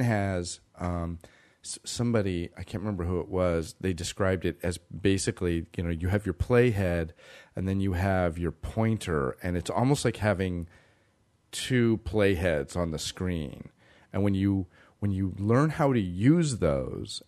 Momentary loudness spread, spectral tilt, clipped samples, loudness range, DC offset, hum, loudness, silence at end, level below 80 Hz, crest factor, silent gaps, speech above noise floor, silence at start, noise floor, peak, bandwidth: 11 LU; -6 dB/octave; under 0.1%; 3 LU; under 0.1%; none; -28 LUFS; 0.1 s; -46 dBFS; 20 dB; none; 40 dB; 0 s; -67 dBFS; -8 dBFS; 13.5 kHz